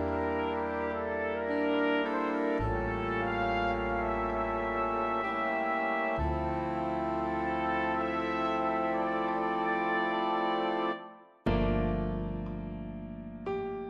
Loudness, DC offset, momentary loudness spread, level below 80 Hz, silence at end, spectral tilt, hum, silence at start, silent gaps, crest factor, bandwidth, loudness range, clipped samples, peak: -31 LUFS; under 0.1%; 7 LU; -44 dBFS; 0 s; -8 dB/octave; none; 0 s; none; 14 dB; 7.6 kHz; 1 LU; under 0.1%; -16 dBFS